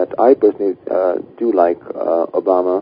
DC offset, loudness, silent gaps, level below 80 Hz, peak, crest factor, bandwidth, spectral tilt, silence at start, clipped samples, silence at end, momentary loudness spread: under 0.1%; -16 LUFS; none; -62 dBFS; 0 dBFS; 16 dB; 5.2 kHz; -10.5 dB/octave; 0 s; under 0.1%; 0 s; 8 LU